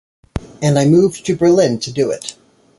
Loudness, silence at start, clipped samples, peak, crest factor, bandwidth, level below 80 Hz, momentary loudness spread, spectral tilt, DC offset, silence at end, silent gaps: -15 LUFS; 0.35 s; under 0.1%; -2 dBFS; 14 dB; 11.5 kHz; -42 dBFS; 17 LU; -6 dB/octave; under 0.1%; 0.45 s; none